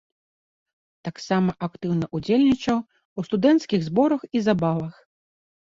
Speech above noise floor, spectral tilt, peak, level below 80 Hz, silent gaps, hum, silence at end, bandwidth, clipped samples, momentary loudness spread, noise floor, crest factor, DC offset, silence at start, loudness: over 68 dB; -7 dB/octave; -6 dBFS; -58 dBFS; 3.05-3.16 s; none; 0.75 s; 7.6 kHz; under 0.1%; 15 LU; under -90 dBFS; 18 dB; under 0.1%; 1.05 s; -23 LUFS